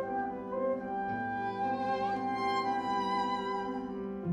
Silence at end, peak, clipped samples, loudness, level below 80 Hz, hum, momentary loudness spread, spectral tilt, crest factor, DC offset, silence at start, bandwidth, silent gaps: 0 s; -22 dBFS; under 0.1%; -34 LUFS; -64 dBFS; none; 5 LU; -6 dB/octave; 12 dB; under 0.1%; 0 s; 10.5 kHz; none